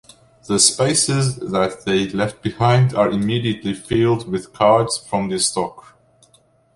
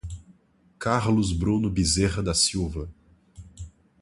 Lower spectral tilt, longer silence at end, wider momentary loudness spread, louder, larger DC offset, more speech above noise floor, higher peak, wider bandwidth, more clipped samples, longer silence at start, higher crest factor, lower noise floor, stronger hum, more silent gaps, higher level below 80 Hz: about the same, -4.5 dB/octave vs -4.5 dB/octave; first, 0.95 s vs 0.3 s; second, 8 LU vs 22 LU; first, -18 LUFS vs -24 LUFS; neither; about the same, 38 dB vs 36 dB; first, 0 dBFS vs -6 dBFS; about the same, 11.5 kHz vs 11.5 kHz; neither; first, 0.45 s vs 0.05 s; about the same, 18 dB vs 20 dB; second, -56 dBFS vs -60 dBFS; neither; neither; second, -50 dBFS vs -38 dBFS